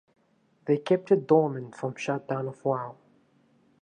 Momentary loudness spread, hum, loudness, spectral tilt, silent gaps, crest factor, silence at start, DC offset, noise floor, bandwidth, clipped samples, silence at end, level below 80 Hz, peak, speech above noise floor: 13 LU; none; -27 LUFS; -7.5 dB/octave; none; 20 dB; 0.65 s; under 0.1%; -67 dBFS; 9.6 kHz; under 0.1%; 0.9 s; -80 dBFS; -8 dBFS; 40 dB